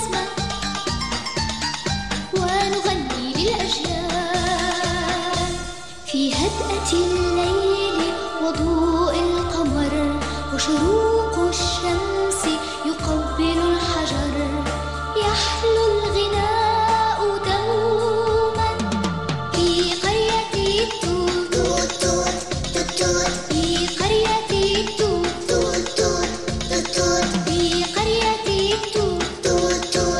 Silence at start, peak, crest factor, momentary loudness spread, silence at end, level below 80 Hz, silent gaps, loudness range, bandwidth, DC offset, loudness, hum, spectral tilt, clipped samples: 0 s; -6 dBFS; 14 dB; 5 LU; 0 s; -34 dBFS; none; 2 LU; 14 kHz; 0.8%; -21 LUFS; none; -4 dB/octave; under 0.1%